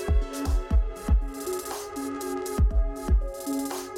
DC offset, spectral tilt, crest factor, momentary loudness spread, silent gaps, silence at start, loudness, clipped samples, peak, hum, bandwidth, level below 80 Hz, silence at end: under 0.1%; -6 dB/octave; 14 dB; 6 LU; none; 0 s; -29 LUFS; under 0.1%; -12 dBFS; none; 16.5 kHz; -26 dBFS; 0 s